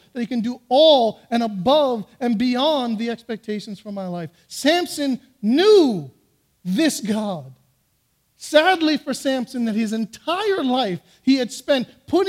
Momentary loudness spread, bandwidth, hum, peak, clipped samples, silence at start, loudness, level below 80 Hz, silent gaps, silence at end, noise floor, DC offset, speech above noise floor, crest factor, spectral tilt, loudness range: 15 LU; 16 kHz; none; -2 dBFS; under 0.1%; 0.15 s; -20 LUFS; -64 dBFS; none; 0 s; -66 dBFS; under 0.1%; 46 dB; 18 dB; -4.5 dB/octave; 3 LU